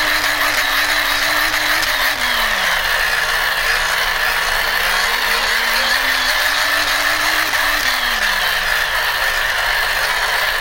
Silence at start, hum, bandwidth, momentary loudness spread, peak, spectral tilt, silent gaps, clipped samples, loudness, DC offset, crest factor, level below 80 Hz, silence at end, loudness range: 0 s; none; 16 kHz; 1 LU; -2 dBFS; 0 dB/octave; none; under 0.1%; -15 LUFS; under 0.1%; 16 dB; -34 dBFS; 0 s; 1 LU